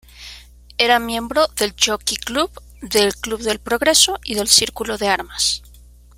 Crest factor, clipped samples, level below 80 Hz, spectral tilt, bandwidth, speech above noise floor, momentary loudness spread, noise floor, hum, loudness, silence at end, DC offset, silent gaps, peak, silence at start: 20 dB; under 0.1%; -42 dBFS; -1 dB/octave; 17 kHz; 26 dB; 13 LU; -44 dBFS; 60 Hz at -40 dBFS; -17 LUFS; 0.6 s; under 0.1%; none; 0 dBFS; 0.15 s